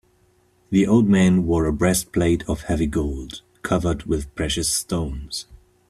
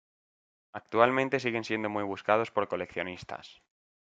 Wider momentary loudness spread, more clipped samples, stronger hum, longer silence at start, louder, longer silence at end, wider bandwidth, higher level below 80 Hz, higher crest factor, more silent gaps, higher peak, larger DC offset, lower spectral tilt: second, 14 LU vs 18 LU; neither; neither; about the same, 0.7 s vs 0.75 s; first, -21 LUFS vs -29 LUFS; second, 0.35 s vs 0.6 s; first, 14 kHz vs 8 kHz; first, -36 dBFS vs -72 dBFS; second, 16 dB vs 26 dB; neither; about the same, -6 dBFS vs -6 dBFS; neither; about the same, -5.5 dB/octave vs -5.5 dB/octave